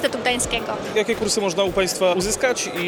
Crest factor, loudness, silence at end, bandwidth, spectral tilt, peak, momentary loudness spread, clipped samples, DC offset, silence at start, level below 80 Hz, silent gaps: 14 dB; -21 LUFS; 0 s; 19.5 kHz; -2.5 dB/octave; -6 dBFS; 3 LU; under 0.1%; under 0.1%; 0 s; -44 dBFS; none